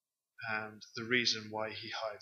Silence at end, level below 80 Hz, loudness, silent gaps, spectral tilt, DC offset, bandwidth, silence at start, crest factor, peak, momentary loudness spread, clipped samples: 0 s; -84 dBFS; -36 LUFS; none; -2.5 dB/octave; under 0.1%; 15 kHz; 0.4 s; 22 dB; -16 dBFS; 15 LU; under 0.1%